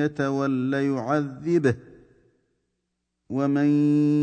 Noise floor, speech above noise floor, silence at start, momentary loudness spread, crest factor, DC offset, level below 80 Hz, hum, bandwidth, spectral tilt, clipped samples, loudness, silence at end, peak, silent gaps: -79 dBFS; 56 dB; 0 s; 6 LU; 16 dB; under 0.1%; -64 dBFS; none; 8.8 kHz; -8 dB/octave; under 0.1%; -24 LUFS; 0 s; -8 dBFS; none